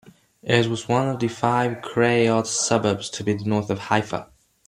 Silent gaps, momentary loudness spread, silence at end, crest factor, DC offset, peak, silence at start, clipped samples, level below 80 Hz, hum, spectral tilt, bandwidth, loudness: none; 6 LU; 0.4 s; 20 dB; under 0.1%; -4 dBFS; 0.45 s; under 0.1%; -60 dBFS; none; -4.5 dB/octave; 12.5 kHz; -22 LUFS